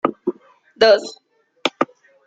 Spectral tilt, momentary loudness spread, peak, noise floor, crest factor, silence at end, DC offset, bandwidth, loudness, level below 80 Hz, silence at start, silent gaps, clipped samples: -3.5 dB/octave; 14 LU; 0 dBFS; -49 dBFS; 20 dB; 0.45 s; under 0.1%; 9 kHz; -19 LUFS; -64 dBFS; 0.05 s; none; under 0.1%